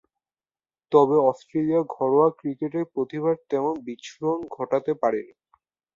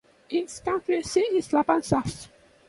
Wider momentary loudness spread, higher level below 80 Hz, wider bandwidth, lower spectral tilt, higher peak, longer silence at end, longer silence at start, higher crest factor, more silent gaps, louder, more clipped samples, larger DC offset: first, 10 LU vs 7 LU; second, -70 dBFS vs -54 dBFS; second, 7.4 kHz vs 11.5 kHz; first, -7.5 dB/octave vs -5 dB/octave; first, -4 dBFS vs -8 dBFS; first, 0.7 s vs 0.4 s; first, 0.9 s vs 0.3 s; about the same, 20 dB vs 20 dB; neither; about the same, -24 LUFS vs -26 LUFS; neither; neither